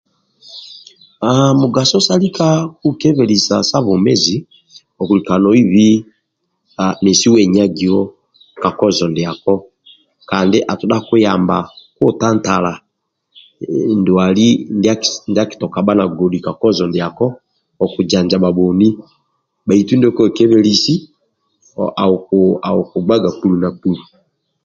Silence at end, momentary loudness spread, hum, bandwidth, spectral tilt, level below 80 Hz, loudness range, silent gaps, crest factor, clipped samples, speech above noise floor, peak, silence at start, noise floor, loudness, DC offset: 0.65 s; 10 LU; none; 7.8 kHz; -5.5 dB/octave; -48 dBFS; 3 LU; none; 14 dB; under 0.1%; 57 dB; 0 dBFS; 0.5 s; -70 dBFS; -14 LUFS; under 0.1%